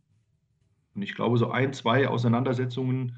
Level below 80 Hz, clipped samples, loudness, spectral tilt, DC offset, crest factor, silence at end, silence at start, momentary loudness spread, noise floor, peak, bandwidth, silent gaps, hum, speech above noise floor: -68 dBFS; under 0.1%; -26 LUFS; -7.5 dB/octave; under 0.1%; 16 dB; 0 s; 0.95 s; 11 LU; -70 dBFS; -10 dBFS; 7.8 kHz; none; none; 44 dB